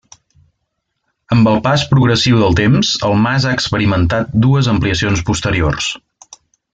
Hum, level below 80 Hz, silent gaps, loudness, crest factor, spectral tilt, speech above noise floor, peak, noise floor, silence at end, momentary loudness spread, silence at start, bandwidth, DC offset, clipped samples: none; -34 dBFS; none; -13 LUFS; 12 dB; -5.5 dB/octave; 59 dB; -2 dBFS; -71 dBFS; 0.75 s; 5 LU; 1.3 s; 9.2 kHz; under 0.1%; under 0.1%